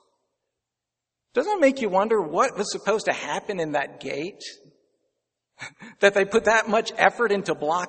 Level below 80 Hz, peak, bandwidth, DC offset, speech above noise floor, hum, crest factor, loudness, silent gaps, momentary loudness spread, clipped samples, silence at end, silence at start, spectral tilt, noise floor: -66 dBFS; 0 dBFS; 8.8 kHz; under 0.1%; 63 dB; none; 24 dB; -23 LUFS; none; 17 LU; under 0.1%; 0 s; 1.35 s; -3.5 dB/octave; -86 dBFS